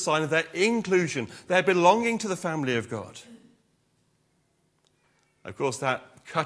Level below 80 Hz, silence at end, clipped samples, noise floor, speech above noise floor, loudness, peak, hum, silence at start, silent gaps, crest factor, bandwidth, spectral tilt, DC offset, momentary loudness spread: -72 dBFS; 0 s; under 0.1%; -70 dBFS; 44 dB; -25 LUFS; -6 dBFS; none; 0 s; none; 22 dB; 11 kHz; -4.5 dB/octave; under 0.1%; 17 LU